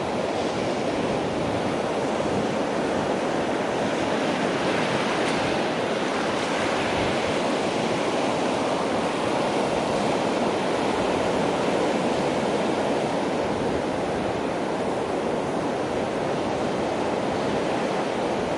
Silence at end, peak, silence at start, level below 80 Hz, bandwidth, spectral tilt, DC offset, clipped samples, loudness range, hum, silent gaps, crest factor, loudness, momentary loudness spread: 0 s; -10 dBFS; 0 s; -52 dBFS; 11.5 kHz; -5 dB/octave; under 0.1%; under 0.1%; 2 LU; none; none; 14 dB; -25 LUFS; 3 LU